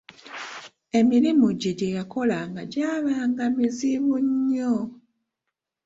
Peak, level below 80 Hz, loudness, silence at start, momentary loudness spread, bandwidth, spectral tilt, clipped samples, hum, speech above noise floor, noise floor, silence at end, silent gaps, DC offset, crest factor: -8 dBFS; -64 dBFS; -23 LUFS; 0.25 s; 17 LU; 7.8 kHz; -6 dB/octave; under 0.1%; none; 61 dB; -84 dBFS; 0.9 s; none; under 0.1%; 16 dB